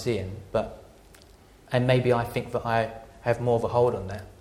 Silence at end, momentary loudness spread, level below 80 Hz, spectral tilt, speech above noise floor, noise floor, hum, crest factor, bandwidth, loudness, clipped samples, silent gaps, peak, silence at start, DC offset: 0.05 s; 11 LU; -50 dBFS; -7 dB/octave; 27 dB; -53 dBFS; none; 18 dB; 16 kHz; -26 LUFS; under 0.1%; none; -10 dBFS; 0 s; under 0.1%